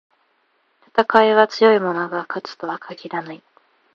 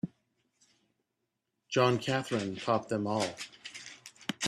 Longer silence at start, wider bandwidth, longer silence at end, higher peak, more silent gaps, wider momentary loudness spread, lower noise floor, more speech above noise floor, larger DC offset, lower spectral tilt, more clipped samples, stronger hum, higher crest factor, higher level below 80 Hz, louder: first, 0.95 s vs 0.05 s; second, 7.2 kHz vs 13.5 kHz; first, 0.6 s vs 0 s; first, 0 dBFS vs -12 dBFS; neither; about the same, 15 LU vs 17 LU; second, -64 dBFS vs -84 dBFS; second, 46 dB vs 53 dB; neither; about the same, -5.5 dB/octave vs -4.5 dB/octave; neither; neither; about the same, 20 dB vs 22 dB; first, -66 dBFS vs -74 dBFS; first, -18 LUFS vs -32 LUFS